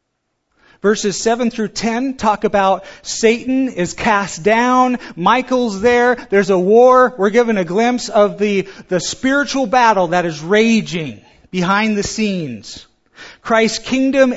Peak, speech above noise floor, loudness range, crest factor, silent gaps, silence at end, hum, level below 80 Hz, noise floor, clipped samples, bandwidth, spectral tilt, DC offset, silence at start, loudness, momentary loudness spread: 0 dBFS; 56 dB; 5 LU; 16 dB; none; 0 s; none; -48 dBFS; -71 dBFS; under 0.1%; 8 kHz; -4.5 dB/octave; under 0.1%; 0.85 s; -15 LUFS; 9 LU